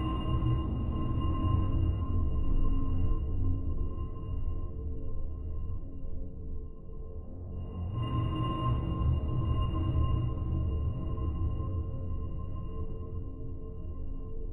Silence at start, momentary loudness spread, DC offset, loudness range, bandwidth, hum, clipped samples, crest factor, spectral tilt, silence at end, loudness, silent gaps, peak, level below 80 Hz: 0 s; 12 LU; under 0.1%; 9 LU; 3.1 kHz; none; under 0.1%; 14 dB; -10.5 dB/octave; 0 s; -34 LUFS; none; -16 dBFS; -34 dBFS